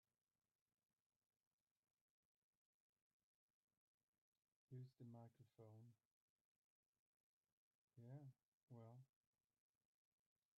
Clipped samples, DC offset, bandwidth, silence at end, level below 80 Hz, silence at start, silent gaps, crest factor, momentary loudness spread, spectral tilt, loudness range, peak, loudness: under 0.1%; under 0.1%; 2.1 kHz; 1.5 s; under -90 dBFS; 4.7 s; 6.05-6.93 s, 6.99-7.43 s, 7.52-7.88 s, 8.45-8.68 s; 20 dB; 6 LU; -9.5 dB/octave; 1 LU; -50 dBFS; -65 LUFS